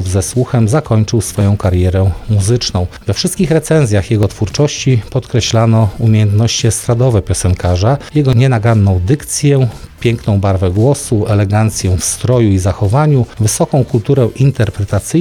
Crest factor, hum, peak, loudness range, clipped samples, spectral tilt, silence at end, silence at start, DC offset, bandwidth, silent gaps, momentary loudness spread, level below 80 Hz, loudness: 10 dB; none; 0 dBFS; 1 LU; under 0.1%; -6 dB/octave; 0 s; 0 s; under 0.1%; 14 kHz; none; 4 LU; -32 dBFS; -12 LUFS